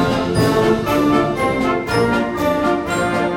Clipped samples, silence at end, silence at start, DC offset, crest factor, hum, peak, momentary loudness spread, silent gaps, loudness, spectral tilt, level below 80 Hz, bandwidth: under 0.1%; 0 s; 0 s; under 0.1%; 14 dB; none; -2 dBFS; 3 LU; none; -17 LUFS; -6 dB/octave; -38 dBFS; 16.5 kHz